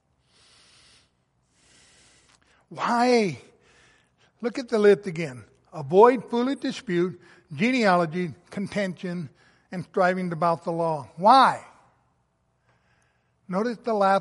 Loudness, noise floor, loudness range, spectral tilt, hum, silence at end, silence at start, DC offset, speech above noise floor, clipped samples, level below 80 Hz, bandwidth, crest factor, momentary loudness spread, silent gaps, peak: -23 LUFS; -70 dBFS; 6 LU; -6 dB/octave; none; 0 s; 2.7 s; under 0.1%; 47 dB; under 0.1%; -70 dBFS; 11.5 kHz; 22 dB; 18 LU; none; -4 dBFS